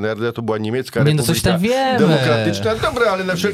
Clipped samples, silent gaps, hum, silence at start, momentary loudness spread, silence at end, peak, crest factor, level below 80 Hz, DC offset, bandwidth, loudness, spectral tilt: under 0.1%; none; none; 0 s; 7 LU; 0 s; -2 dBFS; 14 dB; -42 dBFS; under 0.1%; 16 kHz; -17 LUFS; -5.5 dB/octave